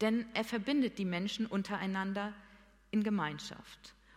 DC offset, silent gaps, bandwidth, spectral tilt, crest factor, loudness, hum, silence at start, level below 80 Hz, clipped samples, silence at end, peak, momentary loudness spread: under 0.1%; none; 15.5 kHz; -5.5 dB/octave; 18 dB; -36 LUFS; none; 0 s; -68 dBFS; under 0.1%; 0.25 s; -18 dBFS; 16 LU